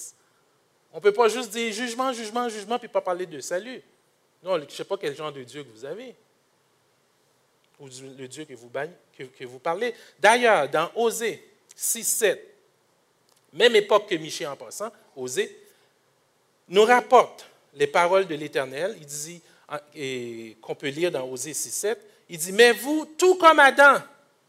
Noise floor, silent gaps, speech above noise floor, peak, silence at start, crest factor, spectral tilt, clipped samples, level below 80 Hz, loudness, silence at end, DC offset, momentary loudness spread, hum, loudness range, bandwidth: -66 dBFS; none; 42 dB; -4 dBFS; 0 s; 22 dB; -2.5 dB/octave; under 0.1%; -76 dBFS; -23 LUFS; 0.45 s; under 0.1%; 22 LU; none; 14 LU; 16 kHz